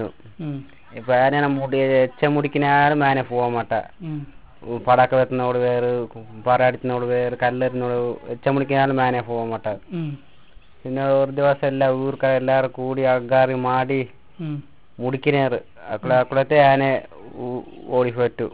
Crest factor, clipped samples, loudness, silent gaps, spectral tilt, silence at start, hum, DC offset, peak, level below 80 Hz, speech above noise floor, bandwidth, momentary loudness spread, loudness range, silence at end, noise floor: 18 dB; under 0.1%; -20 LUFS; none; -10.5 dB/octave; 0 s; none; 0.5%; -2 dBFS; -54 dBFS; 29 dB; 4 kHz; 15 LU; 3 LU; 0.05 s; -49 dBFS